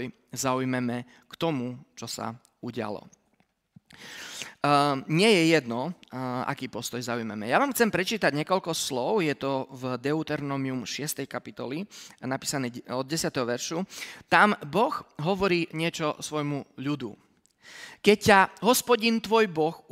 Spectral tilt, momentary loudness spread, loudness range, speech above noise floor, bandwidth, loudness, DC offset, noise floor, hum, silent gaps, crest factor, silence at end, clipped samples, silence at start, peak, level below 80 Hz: -4 dB/octave; 16 LU; 7 LU; 43 dB; 16 kHz; -27 LUFS; under 0.1%; -70 dBFS; none; none; 24 dB; 0.15 s; under 0.1%; 0 s; -4 dBFS; -64 dBFS